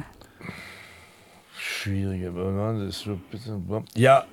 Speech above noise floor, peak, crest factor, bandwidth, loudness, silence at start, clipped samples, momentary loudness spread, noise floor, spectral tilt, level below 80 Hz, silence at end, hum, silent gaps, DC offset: 28 dB; -4 dBFS; 22 dB; 17 kHz; -27 LUFS; 0 s; under 0.1%; 22 LU; -53 dBFS; -6 dB/octave; -58 dBFS; 0.05 s; none; none; under 0.1%